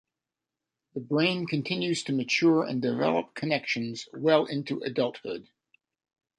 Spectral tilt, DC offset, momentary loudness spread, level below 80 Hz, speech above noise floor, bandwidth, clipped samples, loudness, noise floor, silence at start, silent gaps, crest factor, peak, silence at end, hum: -5.5 dB/octave; under 0.1%; 12 LU; -72 dBFS; 61 dB; 10.5 kHz; under 0.1%; -27 LUFS; -89 dBFS; 0.95 s; none; 20 dB; -10 dBFS; 0.95 s; none